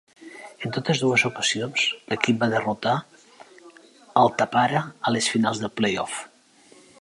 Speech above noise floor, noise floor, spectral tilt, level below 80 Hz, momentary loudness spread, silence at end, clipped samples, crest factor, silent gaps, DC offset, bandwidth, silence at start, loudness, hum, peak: 31 dB; -54 dBFS; -4 dB/octave; -66 dBFS; 11 LU; 0.75 s; under 0.1%; 24 dB; none; under 0.1%; 11.5 kHz; 0.2 s; -23 LUFS; none; 0 dBFS